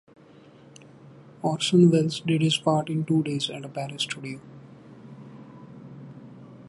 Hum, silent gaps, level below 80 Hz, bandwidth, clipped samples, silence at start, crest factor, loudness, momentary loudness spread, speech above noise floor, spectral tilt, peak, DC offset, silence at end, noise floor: none; none; -70 dBFS; 11.5 kHz; under 0.1%; 1.45 s; 20 dB; -24 LUFS; 26 LU; 28 dB; -6 dB/octave; -6 dBFS; under 0.1%; 0 s; -51 dBFS